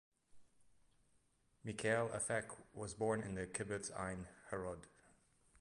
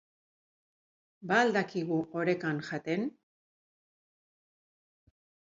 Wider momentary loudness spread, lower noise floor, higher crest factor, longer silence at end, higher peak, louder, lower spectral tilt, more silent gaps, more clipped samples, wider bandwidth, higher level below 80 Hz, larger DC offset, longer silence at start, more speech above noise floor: first, 13 LU vs 9 LU; second, -77 dBFS vs under -90 dBFS; about the same, 22 dB vs 24 dB; second, 0.7 s vs 2.5 s; second, -24 dBFS vs -12 dBFS; second, -43 LUFS vs -31 LUFS; second, -4.5 dB/octave vs -6 dB/octave; neither; neither; first, 11.5 kHz vs 7.8 kHz; first, -68 dBFS vs -80 dBFS; neither; second, 0.35 s vs 1.2 s; second, 34 dB vs over 59 dB